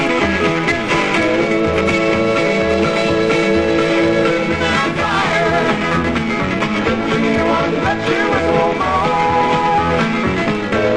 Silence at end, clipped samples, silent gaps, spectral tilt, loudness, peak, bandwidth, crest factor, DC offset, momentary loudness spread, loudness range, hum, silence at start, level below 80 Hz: 0 s; under 0.1%; none; -5.5 dB/octave; -15 LUFS; -2 dBFS; 10.5 kHz; 12 dB; 0.7%; 3 LU; 1 LU; none; 0 s; -40 dBFS